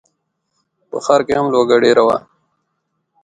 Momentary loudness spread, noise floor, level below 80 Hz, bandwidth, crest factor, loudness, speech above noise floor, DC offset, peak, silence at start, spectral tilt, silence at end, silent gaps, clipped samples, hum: 11 LU; -71 dBFS; -56 dBFS; 9.4 kHz; 16 dB; -14 LUFS; 58 dB; under 0.1%; 0 dBFS; 0.95 s; -5 dB/octave; 1.05 s; none; under 0.1%; none